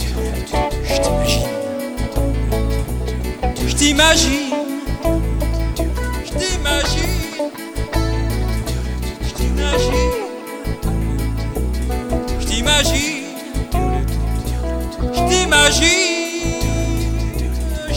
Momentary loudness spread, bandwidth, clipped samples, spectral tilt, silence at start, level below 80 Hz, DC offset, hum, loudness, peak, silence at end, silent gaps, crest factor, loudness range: 11 LU; 17.5 kHz; under 0.1%; -4 dB/octave; 0 s; -22 dBFS; under 0.1%; none; -18 LUFS; -2 dBFS; 0 s; none; 16 dB; 5 LU